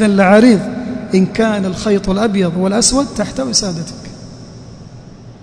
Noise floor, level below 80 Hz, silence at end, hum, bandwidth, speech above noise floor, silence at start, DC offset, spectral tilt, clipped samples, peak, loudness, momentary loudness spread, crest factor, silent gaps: -35 dBFS; -38 dBFS; 0.05 s; none; 10.5 kHz; 22 dB; 0 s; under 0.1%; -4.5 dB/octave; 0.2%; 0 dBFS; -13 LUFS; 24 LU; 14 dB; none